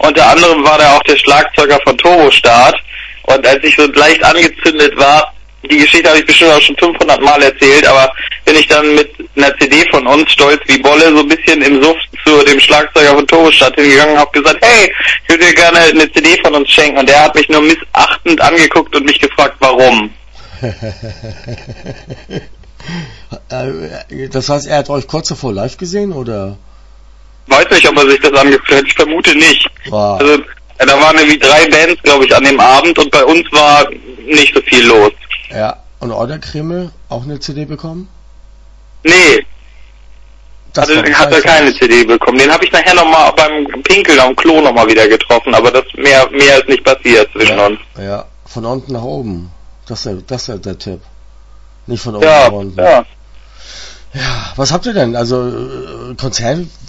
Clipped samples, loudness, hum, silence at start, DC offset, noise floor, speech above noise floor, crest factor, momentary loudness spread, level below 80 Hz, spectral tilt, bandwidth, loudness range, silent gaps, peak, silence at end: 2%; -6 LUFS; none; 0 s; under 0.1%; -37 dBFS; 29 dB; 8 dB; 18 LU; -34 dBFS; -3.5 dB/octave; 11 kHz; 13 LU; none; 0 dBFS; 0.2 s